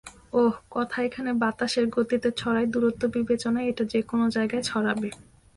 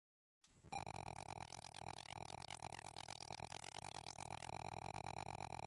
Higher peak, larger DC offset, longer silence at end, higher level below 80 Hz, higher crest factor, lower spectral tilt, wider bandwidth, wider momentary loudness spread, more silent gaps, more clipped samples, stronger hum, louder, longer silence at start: first, -12 dBFS vs -34 dBFS; neither; first, 0.35 s vs 0 s; first, -58 dBFS vs -70 dBFS; about the same, 14 dB vs 18 dB; first, -5 dB/octave vs -3 dB/octave; about the same, 11.5 kHz vs 11.5 kHz; about the same, 4 LU vs 3 LU; neither; neither; neither; first, -26 LUFS vs -52 LUFS; second, 0.05 s vs 0.45 s